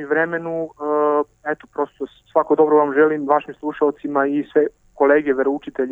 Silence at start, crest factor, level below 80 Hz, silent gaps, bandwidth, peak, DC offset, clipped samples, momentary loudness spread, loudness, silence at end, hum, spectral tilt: 0 s; 16 dB; -60 dBFS; none; 3.8 kHz; -2 dBFS; under 0.1%; under 0.1%; 11 LU; -19 LUFS; 0 s; none; -8 dB/octave